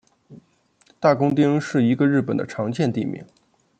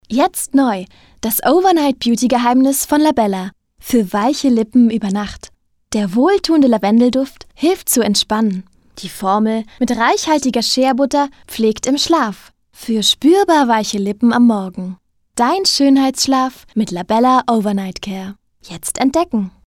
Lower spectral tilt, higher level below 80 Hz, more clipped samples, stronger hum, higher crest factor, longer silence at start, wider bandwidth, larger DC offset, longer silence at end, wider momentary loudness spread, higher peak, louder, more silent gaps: first, -7.5 dB/octave vs -4 dB/octave; second, -64 dBFS vs -48 dBFS; neither; neither; first, 18 dB vs 12 dB; first, 0.3 s vs 0.1 s; second, 8.8 kHz vs 18 kHz; neither; first, 0.55 s vs 0.2 s; second, 9 LU vs 13 LU; about the same, -4 dBFS vs -2 dBFS; second, -21 LUFS vs -15 LUFS; neither